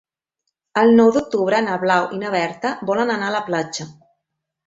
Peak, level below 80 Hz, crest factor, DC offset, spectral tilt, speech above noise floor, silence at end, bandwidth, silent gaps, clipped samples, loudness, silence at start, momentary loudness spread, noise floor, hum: -2 dBFS; -62 dBFS; 18 dB; under 0.1%; -5 dB/octave; 61 dB; 0.75 s; 7.8 kHz; none; under 0.1%; -18 LUFS; 0.75 s; 12 LU; -79 dBFS; none